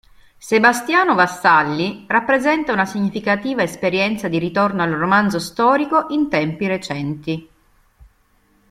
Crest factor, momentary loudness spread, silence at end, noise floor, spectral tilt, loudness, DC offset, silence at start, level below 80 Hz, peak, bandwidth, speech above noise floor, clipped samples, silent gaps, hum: 18 dB; 9 LU; 1.3 s; -58 dBFS; -5 dB/octave; -17 LUFS; under 0.1%; 0.45 s; -54 dBFS; -2 dBFS; 15.5 kHz; 41 dB; under 0.1%; none; none